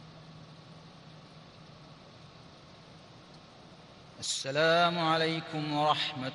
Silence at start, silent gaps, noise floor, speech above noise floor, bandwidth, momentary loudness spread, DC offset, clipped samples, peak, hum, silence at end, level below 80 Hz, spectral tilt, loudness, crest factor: 0 s; none; -53 dBFS; 24 dB; 11.5 kHz; 26 LU; under 0.1%; under 0.1%; -14 dBFS; none; 0 s; -70 dBFS; -3.5 dB/octave; -29 LUFS; 20 dB